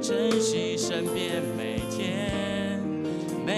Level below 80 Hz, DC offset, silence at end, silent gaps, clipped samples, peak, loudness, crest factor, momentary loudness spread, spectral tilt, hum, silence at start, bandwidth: -52 dBFS; under 0.1%; 0 s; none; under 0.1%; -12 dBFS; -28 LUFS; 16 dB; 6 LU; -4.5 dB/octave; none; 0 s; 14 kHz